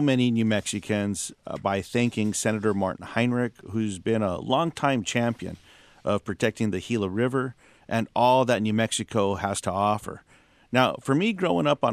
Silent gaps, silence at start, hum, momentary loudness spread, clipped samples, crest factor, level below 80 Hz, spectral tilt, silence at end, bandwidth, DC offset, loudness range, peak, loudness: none; 0 s; none; 8 LU; under 0.1%; 22 dB; -62 dBFS; -5 dB/octave; 0 s; 14 kHz; under 0.1%; 2 LU; -4 dBFS; -26 LUFS